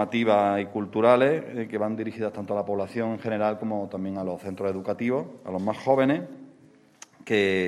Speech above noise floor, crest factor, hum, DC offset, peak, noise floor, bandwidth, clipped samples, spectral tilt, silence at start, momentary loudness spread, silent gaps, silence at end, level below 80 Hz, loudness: 30 dB; 20 dB; none; under 0.1%; -6 dBFS; -56 dBFS; 12.5 kHz; under 0.1%; -6.5 dB/octave; 0 s; 11 LU; none; 0 s; -72 dBFS; -26 LUFS